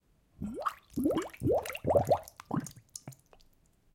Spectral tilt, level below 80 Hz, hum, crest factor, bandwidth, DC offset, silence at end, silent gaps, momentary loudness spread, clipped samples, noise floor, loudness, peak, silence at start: -6.5 dB/octave; -58 dBFS; none; 20 dB; 17 kHz; under 0.1%; 0.8 s; none; 18 LU; under 0.1%; -66 dBFS; -33 LUFS; -14 dBFS; 0.4 s